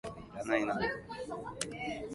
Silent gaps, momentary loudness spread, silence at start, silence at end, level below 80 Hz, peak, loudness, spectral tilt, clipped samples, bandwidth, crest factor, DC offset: none; 10 LU; 0.05 s; 0 s; -60 dBFS; -14 dBFS; -37 LUFS; -4 dB/octave; under 0.1%; 11.5 kHz; 22 dB; under 0.1%